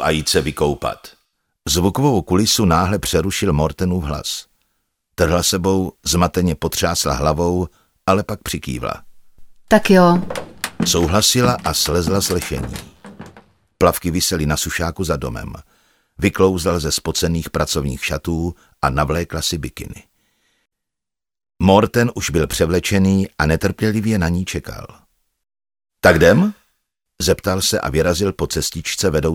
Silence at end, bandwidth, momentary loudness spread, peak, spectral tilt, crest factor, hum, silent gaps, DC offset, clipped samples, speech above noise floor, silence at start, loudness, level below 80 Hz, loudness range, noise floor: 0 s; 18 kHz; 12 LU; 0 dBFS; -4.5 dB/octave; 18 dB; none; none; under 0.1%; under 0.1%; 71 dB; 0 s; -18 LUFS; -34 dBFS; 4 LU; -88 dBFS